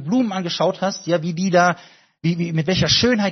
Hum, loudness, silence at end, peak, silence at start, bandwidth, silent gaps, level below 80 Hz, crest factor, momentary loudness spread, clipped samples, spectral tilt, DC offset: none; -19 LUFS; 0 s; -2 dBFS; 0 s; 6.4 kHz; none; -50 dBFS; 18 dB; 9 LU; under 0.1%; -4 dB/octave; under 0.1%